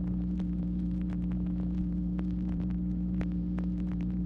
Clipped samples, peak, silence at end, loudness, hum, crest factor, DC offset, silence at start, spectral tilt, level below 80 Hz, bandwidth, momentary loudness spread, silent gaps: under 0.1%; -18 dBFS; 0 s; -33 LUFS; none; 14 dB; under 0.1%; 0 s; -11 dB/octave; -38 dBFS; 3.9 kHz; 1 LU; none